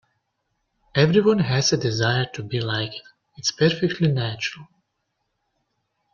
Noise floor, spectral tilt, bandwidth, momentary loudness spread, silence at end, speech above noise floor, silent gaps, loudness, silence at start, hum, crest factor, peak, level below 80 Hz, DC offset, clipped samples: -76 dBFS; -5 dB/octave; 7.4 kHz; 10 LU; 1.5 s; 54 dB; none; -22 LUFS; 0.95 s; none; 20 dB; -4 dBFS; -56 dBFS; under 0.1%; under 0.1%